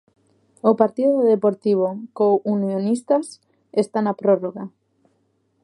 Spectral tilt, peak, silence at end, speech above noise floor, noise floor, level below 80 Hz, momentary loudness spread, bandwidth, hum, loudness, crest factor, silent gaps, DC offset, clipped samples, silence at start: -7.5 dB/octave; -2 dBFS; 0.95 s; 47 dB; -66 dBFS; -74 dBFS; 8 LU; 11 kHz; none; -20 LUFS; 20 dB; none; under 0.1%; under 0.1%; 0.65 s